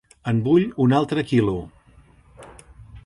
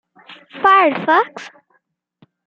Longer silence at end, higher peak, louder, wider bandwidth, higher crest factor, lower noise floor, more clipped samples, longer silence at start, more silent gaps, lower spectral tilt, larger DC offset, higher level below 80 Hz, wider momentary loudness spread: second, 0.05 s vs 1 s; second, -6 dBFS vs -2 dBFS; second, -21 LUFS vs -14 LUFS; first, 11.5 kHz vs 7.6 kHz; about the same, 16 dB vs 18 dB; second, -52 dBFS vs -65 dBFS; neither; about the same, 0.25 s vs 0.3 s; neither; first, -8 dB/octave vs -5 dB/octave; neither; first, -48 dBFS vs -68 dBFS; second, 7 LU vs 22 LU